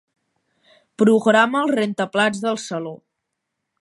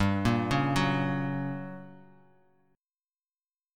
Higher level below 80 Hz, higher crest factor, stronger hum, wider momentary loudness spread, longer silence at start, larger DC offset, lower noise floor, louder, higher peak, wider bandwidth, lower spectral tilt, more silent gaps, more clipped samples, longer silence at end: second, -72 dBFS vs -50 dBFS; about the same, 18 dB vs 18 dB; neither; about the same, 13 LU vs 14 LU; first, 1 s vs 0 s; neither; second, -79 dBFS vs under -90 dBFS; first, -19 LUFS vs -29 LUFS; first, -2 dBFS vs -12 dBFS; second, 11.5 kHz vs 14.5 kHz; second, -5 dB/octave vs -6.5 dB/octave; neither; neither; second, 0.85 s vs 1.8 s